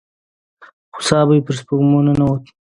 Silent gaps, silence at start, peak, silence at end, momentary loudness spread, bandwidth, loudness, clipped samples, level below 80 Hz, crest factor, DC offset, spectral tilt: none; 0.95 s; 0 dBFS; 0.3 s; 10 LU; 11 kHz; -16 LUFS; under 0.1%; -44 dBFS; 16 dB; under 0.1%; -6.5 dB/octave